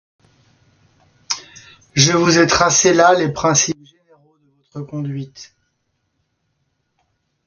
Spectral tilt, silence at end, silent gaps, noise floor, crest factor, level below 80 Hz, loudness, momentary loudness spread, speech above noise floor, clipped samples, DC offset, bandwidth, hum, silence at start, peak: -3.5 dB/octave; 2.05 s; none; -70 dBFS; 20 dB; -50 dBFS; -15 LUFS; 18 LU; 55 dB; under 0.1%; under 0.1%; 10.5 kHz; none; 1.3 s; 0 dBFS